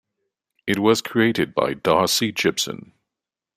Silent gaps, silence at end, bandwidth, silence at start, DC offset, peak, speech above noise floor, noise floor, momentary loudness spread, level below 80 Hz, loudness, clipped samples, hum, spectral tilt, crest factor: none; 0.75 s; 15.5 kHz; 0.65 s; under 0.1%; -4 dBFS; 66 dB; -87 dBFS; 9 LU; -60 dBFS; -20 LUFS; under 0.1%; none; -3.5 dB/octave; 20 dB